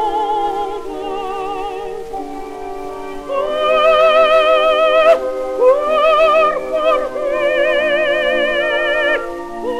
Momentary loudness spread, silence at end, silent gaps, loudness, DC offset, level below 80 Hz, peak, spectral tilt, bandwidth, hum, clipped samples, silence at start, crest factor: 16 LU; 0 s; none; -14 LUFS; under 0.1%; -42 dBFS; -2 dBFS; -3 dB/octave; 13 kHz; none; under 0.1%; 0 s; 14 dB